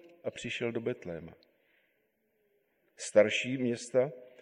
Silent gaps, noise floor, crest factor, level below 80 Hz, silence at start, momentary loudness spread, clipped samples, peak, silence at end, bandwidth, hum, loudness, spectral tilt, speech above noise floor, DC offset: none; -76 dBFS; 24 dB; -70 dBFS; 0.05 s; 16 LU; under 0.1%; -10 dBFS; 0.1 s; 11 kHz; none; -32 LUFS; -4.5 dB/octave; 44 dB; under 0.1%